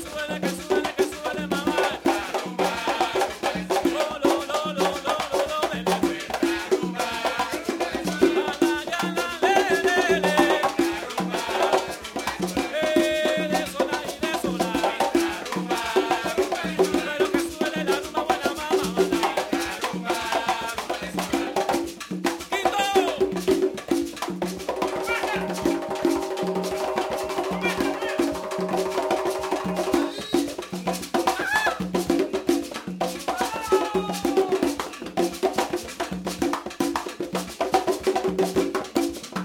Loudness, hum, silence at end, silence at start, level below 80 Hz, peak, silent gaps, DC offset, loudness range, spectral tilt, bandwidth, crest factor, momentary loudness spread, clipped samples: -25 LUFS; none; 0 s; 0 s; -52 dBFS; -4 dBFS; none; under 0.1%; 4 LU; -4 dB/octave; 18 kHz; 20 dB; 6 LU; under 0.1%